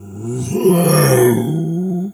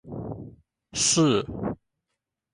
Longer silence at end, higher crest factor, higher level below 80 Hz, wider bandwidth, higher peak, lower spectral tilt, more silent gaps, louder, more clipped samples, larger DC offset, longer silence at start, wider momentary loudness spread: second, 0 s vs 0.8 s; about the same, 14 dB vs 16 dB; about the same, -50 dBFS vs -52 dBFS; first, 18.5 kHz vs 11.5 kHz; first, 0 dBFS vs -12 dBFS; first, -6 dB/octave vs -3.5 dB/octave; neither; first, -15 LUFS vs -24 LUFS; neither; neither; about the same, 0 s vs 0.05 s; second, 10 LU vs 19 LU